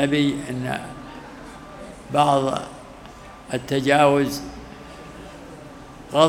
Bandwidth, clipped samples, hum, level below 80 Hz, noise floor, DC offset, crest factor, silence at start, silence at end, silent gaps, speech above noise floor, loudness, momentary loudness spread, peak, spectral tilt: 16.5 kHz; under 0.1%; none; -50 dBFS; -41 dBFS; under 0.1%; 22 dB; 0 s; 0 s; none; 21 dB; -22 LUFS; 23 LU; 0 dBFS; -5.5 dB/octave